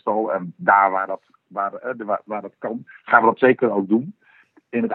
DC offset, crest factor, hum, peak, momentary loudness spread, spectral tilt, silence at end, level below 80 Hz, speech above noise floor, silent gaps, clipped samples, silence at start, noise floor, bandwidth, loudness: under 0.1%; 20 dB; none; 0 dBFS; 15 LU; -10 dB/octave; 0 s; -80 dBFS; 35 dB; none; under 0.1%; 0.05 s; -55 dBFS; 4.2 kHz; -20 LUFS